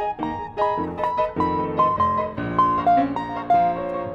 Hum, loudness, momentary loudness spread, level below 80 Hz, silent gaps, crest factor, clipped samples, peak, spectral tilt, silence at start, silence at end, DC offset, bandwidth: none; -22 LUFS; 7 LU; -48 dBFS; none; 14 dB; under 0.1%; -8 dBFS; -8 dB/octave; 0 s; 0 s; under 0.1%; 6.8 kHz